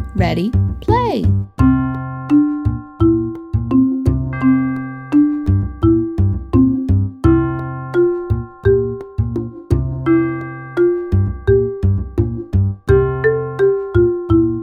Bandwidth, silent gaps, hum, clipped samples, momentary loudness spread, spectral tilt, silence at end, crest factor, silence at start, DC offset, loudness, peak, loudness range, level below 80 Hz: 5.6 kHz; none; none; under 0.1%; 7 LU; -10 dB/octave; 0 s; 16 dB; 0 s; under 0.1%; -17 LUFS; 0 dBFS; 2 LU; -28 dBFS